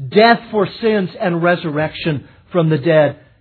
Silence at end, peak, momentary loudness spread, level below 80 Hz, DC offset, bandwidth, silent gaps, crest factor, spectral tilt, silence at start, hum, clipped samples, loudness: 0.25 s; 0 dBFS; 10 LU; -54 dBFS; under 0.1%; 4.5 kHz; none; 16 dB; -9.5 dB/octave; 0 s; none; under 0.1%; -16 LUFS